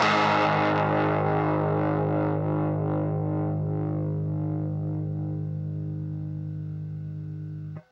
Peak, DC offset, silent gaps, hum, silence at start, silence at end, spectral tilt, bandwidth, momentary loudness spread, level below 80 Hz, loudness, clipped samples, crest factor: -10 dBFS; under 0.1%; none; none; 0 s; 0.1 s; -7.5 dB/octave; 7.4 kHz; 12 LU; -58 dBFS; -27 LUFS; under 0.1%; 16 dB